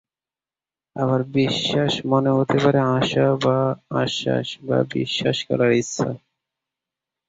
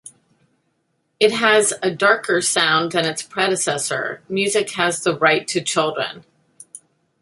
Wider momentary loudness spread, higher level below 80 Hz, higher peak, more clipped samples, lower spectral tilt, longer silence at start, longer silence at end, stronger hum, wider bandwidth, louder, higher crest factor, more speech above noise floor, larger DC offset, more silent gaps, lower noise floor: about the same, 7 LU vs 7 LU; first, -58 dBFS vs -66 dBFS; about the same, -4 dBFS vs -2 dBFS; neither; first, -5.5 dB/octave vs -2.5 dB/octave; first, 0.95 s vs 0.05 s; first, 1.1 s vs 0.45 s; neither; second, 7.8 kHz vs 12 kHz; second, -21 LUFS vs -18 LUFS; about the same, 18 dB vs 20 dB; first, over 70 dB vs 50 dB; neither; neither; first, under -90 dBFS vs -69 dBFS